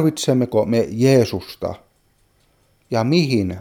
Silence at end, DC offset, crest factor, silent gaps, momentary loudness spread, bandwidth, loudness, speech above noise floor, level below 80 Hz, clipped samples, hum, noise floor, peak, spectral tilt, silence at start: 0 s; under 0.1%; 16 dB; none; 13 LU; 18 kHz; -19 LUFS; 43 dB; -52 dBFS; under 0.1%; none; -60 dBFS; -2 dBFS; -6 dB/octave; 0 s